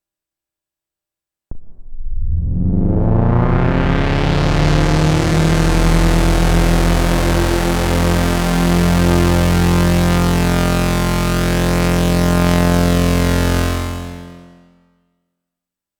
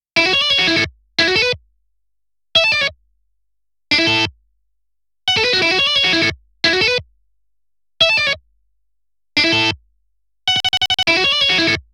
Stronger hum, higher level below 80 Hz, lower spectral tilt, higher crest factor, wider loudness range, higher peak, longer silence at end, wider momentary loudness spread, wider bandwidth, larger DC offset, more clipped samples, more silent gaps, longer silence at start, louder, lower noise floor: neither; first, -20 dBFS vs -50 dBFS; first, -6 dB/octave vs -2.5 dB/octave; about the same, 12 dB vs 16 dB; about the same, 4 LU vs 3 LU; about the same, -2 dBFS vs -2 dBFS; first, 1.6 s vs 0.15 s; second, 4 LU vs 8 LU; first, over 20 kHz vs 16.5 kHz; neither; neither; neither; first, 1.5 s vs 0.15 s; about the same, -15 LUFS vs -14 LUFS; about the same, -86 dBFS vs -83 dBFS